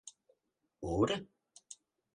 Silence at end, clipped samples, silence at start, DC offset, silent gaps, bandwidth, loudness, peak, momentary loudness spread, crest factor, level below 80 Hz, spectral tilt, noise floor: 0.4 s; under 0.1%; 0.05 s; under 0.1%; none; 11.5 kHz; -35 LUFS; -18 dBFS; 22 LU; 22 dB; -58 dBFS; -5.5 dB/octave; -82 dBFS